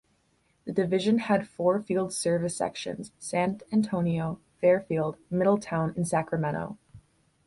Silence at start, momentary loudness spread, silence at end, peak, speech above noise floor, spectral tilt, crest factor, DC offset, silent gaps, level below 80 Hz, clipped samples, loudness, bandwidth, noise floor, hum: 0.65 s; 11 LU; 0.5 s; -12 dBFS; 42 dB; -6 dB/octave; 16 dB; under 0.1%; none; -62 dBFS; under 0.1%; -28 LUFS; 11.5 kHz; -69 dBFS; none